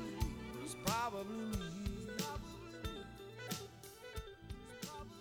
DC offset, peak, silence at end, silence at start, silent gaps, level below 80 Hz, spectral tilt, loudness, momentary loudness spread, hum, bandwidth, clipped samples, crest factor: under 0.1%; -20 dBFS; 0 s; 0 s; none; -52 dBFS; -4.5 dB/octave; -45 LUFS; 13 LU; none; over 20 kHz; under 0.1%; 24 dB